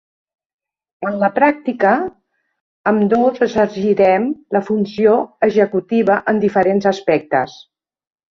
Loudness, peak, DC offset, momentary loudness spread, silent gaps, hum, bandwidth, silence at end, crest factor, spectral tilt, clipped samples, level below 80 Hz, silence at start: -16 LUFS; -2 dBFS; under 0.1%; 6 LU; 2.61-2.84 s; none; 7 kHz; 0.8 s; 16 dB; -7 dB/octave; under 0.1%; -56 dBFS; 1 s